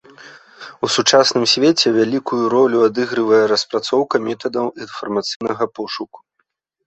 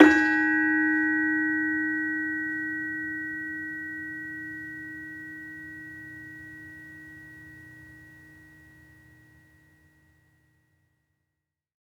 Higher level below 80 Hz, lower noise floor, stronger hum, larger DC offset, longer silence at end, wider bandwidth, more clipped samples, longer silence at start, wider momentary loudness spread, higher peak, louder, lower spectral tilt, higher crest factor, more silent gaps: about the same, -64 dBFS vs -66 dBFS; second, -70 dBFS vs -85 dBFS; neither; neither; second, 0.7 s vs 3.6 s; about the same, 8.4 kHz vs 8 kHz; neither; first, 0.2 s vs 0 s; second, 13 LU vs 23 LU; about the same, 0 dBFS vs -2 dBFS; first, -16 LUFS vs -27 LUFS; second, -3.5 dB/octave vs -5.5 dB/octave; second, 18 dB vs 28 dB; first, 5.36-5.40 s vs none